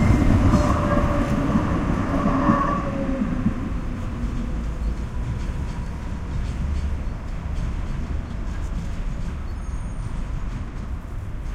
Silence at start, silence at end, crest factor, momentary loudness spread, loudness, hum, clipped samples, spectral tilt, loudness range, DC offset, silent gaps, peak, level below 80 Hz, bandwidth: 0 s; 0 s; 18 dB; 12 LU; -25 LUFS; none; under 0.1%; -7.5 dB/octave; 9 LU; under 0.1%; none; -4 dBFS; -28 dBFS; 12 kHz